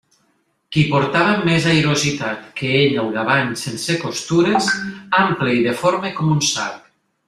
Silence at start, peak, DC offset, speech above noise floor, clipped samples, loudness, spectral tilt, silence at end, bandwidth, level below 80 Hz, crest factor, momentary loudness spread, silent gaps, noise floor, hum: 0.7 s; -2 dBFS; under 0.1%; 47 dB; under 0.1%; -18 LUFS; -4.5 dB/octave; 0.5 s; 13.5 kHz; -54 dBFS; 16 dB; 8 LU; none; -64 dBFS; none